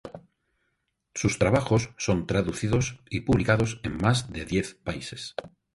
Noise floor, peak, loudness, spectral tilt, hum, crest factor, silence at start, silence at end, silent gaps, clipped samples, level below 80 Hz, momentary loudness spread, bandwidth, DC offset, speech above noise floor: -77 dBFS; -8 dBFS; -27 LUFS; -5.5 dB/octave; none; 20 dB; 0.05 s; 0.3 s; none; under 0.1%; -44 dBFS; 13 LU; 11.5 kHz; under 0.1%; 51 dB